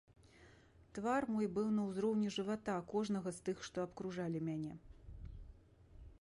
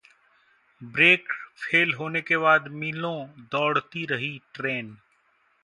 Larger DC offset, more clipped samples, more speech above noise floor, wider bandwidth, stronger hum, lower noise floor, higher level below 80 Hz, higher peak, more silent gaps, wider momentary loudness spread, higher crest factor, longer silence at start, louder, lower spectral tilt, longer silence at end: neither; neither; second, 25 dB vs 41 dB; about the same, 11.5 kHz vs 11 kHz; neither; about the same, -64 dBFS vs -66 dBFS; first, -62 dBFS vs -72 dBFS; second, -26 dBFS vs -4 dBFS; neither; first, 18 LU vs 15 LU; second, 16 dB vs 22 dB; second, 0.35 s vs 0.8 s; second, -40 LUFS vs -24 LUFS; about the same, -6 dB/octave vs -5.5 dB/octave; second, 0.1 s vs 0.7 s